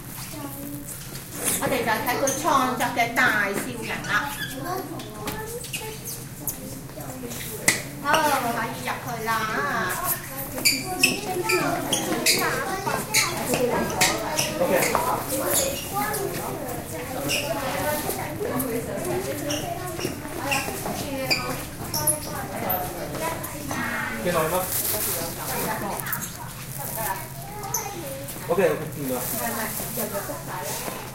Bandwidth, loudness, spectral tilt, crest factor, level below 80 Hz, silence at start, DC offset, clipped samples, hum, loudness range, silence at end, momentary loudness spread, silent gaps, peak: 17 kHz; -25 LUFS; -3 dB/octave; 26 dB; -46 dBFS; 0 s; under 0.1%; under 0.1%; none; 6 LU; 0 s; 11 LU; none; 0 dBFS